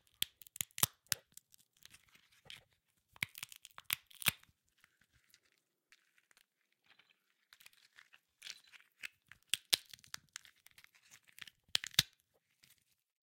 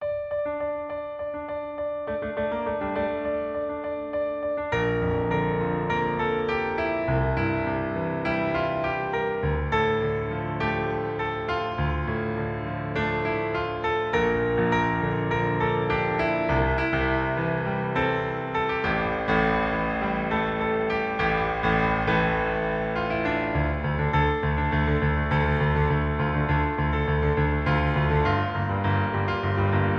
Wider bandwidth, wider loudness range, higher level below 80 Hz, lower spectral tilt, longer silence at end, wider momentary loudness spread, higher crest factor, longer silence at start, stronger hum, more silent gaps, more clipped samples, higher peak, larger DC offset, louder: first, 17 kHz vs 7 kHz; first, 17 LU vs 4 LU; second, -76 dBFS vs -36 dBFS; second, 0 dB/octave vs -8 dB/octave; first, 1.25 s vs 0 s; first, 26 LU vs 6 LU; first, 40 dB vs 16 dB; first, 0.2 s vs 0 s; neither; neither; neither; about the same, -6 dBFS vs -8 dBFS; neither; second, -39 LUFS vs -25 LUFS